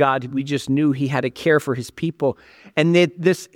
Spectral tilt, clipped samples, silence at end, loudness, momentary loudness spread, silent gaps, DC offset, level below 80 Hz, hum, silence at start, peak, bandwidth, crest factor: -6 dB/octave; under 0.1%; 0.1 s; -20 LUFS; 9 LU; none; under 0.1%; -60 dBFS; none; 0 s; -2 dBFS; 17 kHz; 18 dB